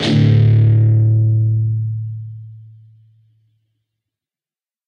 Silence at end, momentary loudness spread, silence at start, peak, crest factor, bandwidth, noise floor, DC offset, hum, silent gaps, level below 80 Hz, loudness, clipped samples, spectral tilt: 2.25 s; 18 LU; 0 s; -2 dBFS; 14 dB; 6.6 kHz; under -90 dBFS; under 0.1%; none; none; -44 dBFS; -14 LUFS; under 0.1%; -8 dB/octave